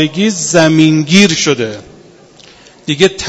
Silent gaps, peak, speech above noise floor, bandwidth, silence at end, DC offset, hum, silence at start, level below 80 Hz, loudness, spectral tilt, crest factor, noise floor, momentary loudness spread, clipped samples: none; 0 dBFS; 30 dB; 11 kHz; 0 s; under 0.1%; none; 0 s; -48 dBFS; -10 LUFS; -4 dB/octave; 12 dB; -40 dBFS; 13 LU; 0.5%